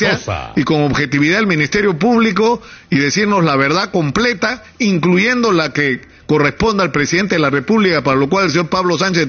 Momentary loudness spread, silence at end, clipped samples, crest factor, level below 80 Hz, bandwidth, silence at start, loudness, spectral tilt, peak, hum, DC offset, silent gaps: 5 LU; 0 s; under 0.1%; 12 dB; -42 dBFS; 7.2 kHz; 0 s; -14 LUFS; -5 dB/octave; -2 dBFS; none; under 0.1%; none